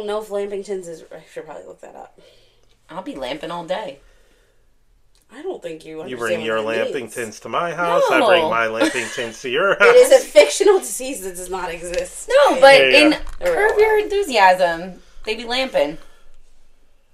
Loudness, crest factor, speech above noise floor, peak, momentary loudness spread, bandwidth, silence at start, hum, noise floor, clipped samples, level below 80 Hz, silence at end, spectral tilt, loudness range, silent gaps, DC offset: -16 LUFS; 18 dB; 38 dB; 0 dBFS; 21 LU; 15.5 kHz; 0 s; none; -55 dBFS; under 0.1%; -44 dBFS; 0.55 s; -2.5 dB/octave; 18 LU; none; under 0.1%